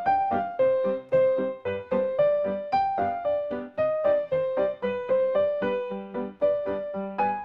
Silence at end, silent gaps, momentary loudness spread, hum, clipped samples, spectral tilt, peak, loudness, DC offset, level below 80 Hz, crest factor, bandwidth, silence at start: 0 s; none; 7 LU; none; under 0.1%; -8.5 dB/octave; -12 dBFS; -26 LUFS; under 0.1%; -64 dBFS; 14 dB; 5.2 kHz; 0 s